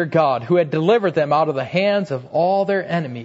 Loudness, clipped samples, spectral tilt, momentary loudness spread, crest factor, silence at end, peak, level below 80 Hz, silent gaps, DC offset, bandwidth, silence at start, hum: -19 LUFS; under 0.1%; -7.5 dB/octave; 4 LU; 14 dB; 0 s; -4 dBFS; -64 dBFS; none; under 0.1%; 8 kHz; 0 s; none